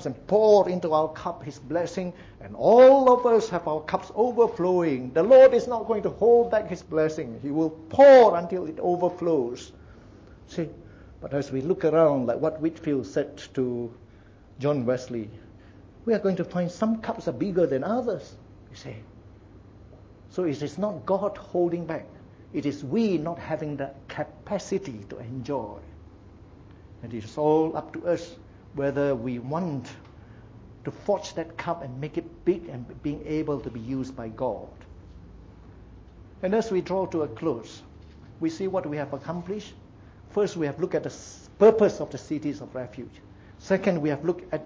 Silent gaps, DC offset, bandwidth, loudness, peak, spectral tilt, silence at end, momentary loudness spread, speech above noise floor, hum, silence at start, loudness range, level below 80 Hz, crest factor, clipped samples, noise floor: none; under 0.1%; 7.6 kHz; -24 LUFS; -6 dBFS; -7 dB/octave; 0 s; 19 LU; 27 dB; none; 0 s; 12 LU; -54 dBFS; 18 dB; under 0.1%; -51 dBFS